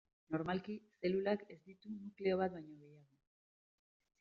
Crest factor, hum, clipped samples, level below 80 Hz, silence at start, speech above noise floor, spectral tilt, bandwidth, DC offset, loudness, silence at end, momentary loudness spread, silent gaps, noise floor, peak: 20 dB; none; under 0.1%; -78 dBFS; 0.3 s; over 49 dB; -5.5 dB/octave; 5.4 kHz; under 0.1%; -41 LUFS; 1.2 s; 20 LU; none; under -90 dBFS; -22 dBFS